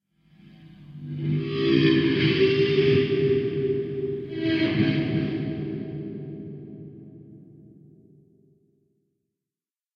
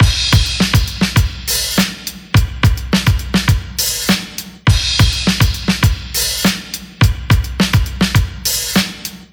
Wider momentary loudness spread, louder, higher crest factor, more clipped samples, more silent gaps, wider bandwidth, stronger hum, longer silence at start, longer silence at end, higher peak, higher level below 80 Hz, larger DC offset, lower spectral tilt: first, 20 LU vs 4 LU; second, -24 LUFS vs -15 LUFS; about the same, 18 dB vs 14 dB; neither; neither; second, 6.4 kHz vs over 20 kHz; neither; first, 0.6 s vs 0 s; first, 2.55 s vs 0.1 s; second, -8 dBFS vs 0 dBFS; second, -58 dBFS vs -22 dBFS; neither; first, -8.5 dB/octave vs -4 dB/octave